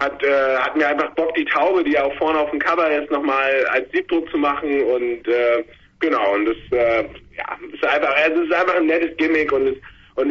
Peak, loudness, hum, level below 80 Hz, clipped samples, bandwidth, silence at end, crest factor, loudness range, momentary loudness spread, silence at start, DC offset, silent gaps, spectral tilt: -4 dBFS; -19 LUFS; none; -52 dBFS; under 0.1%; 7.2 kHz; 0 s; 14 dB; 2 LU; 7 LU; 0 s; under 0.1%; none; -5.5 dB/octave